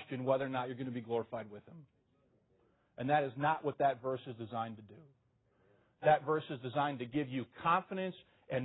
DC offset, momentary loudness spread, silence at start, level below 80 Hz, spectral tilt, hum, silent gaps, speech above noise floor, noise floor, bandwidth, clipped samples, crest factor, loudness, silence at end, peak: under 0.1%; 12 LU; 0 s; -74 dBFS; -2.5 dB/octave; none; none; 38 dB; -74 dBFS; 3.9 kHz; under 0.1%; 22 dB; -36 LUFS; 0 s; -16 dBFS